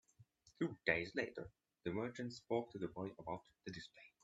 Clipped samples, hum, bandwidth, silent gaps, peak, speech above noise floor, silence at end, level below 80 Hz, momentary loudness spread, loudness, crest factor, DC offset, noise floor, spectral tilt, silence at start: under 0.1%; none; 8 kHz; none; -18 dBFS; 26 dB; 0.15 s; -74 dBFS; 15 LU; -44 LUFS; 28 dB; under 0.1%; -70 dBFS; -6 dB/octave; 0.2 s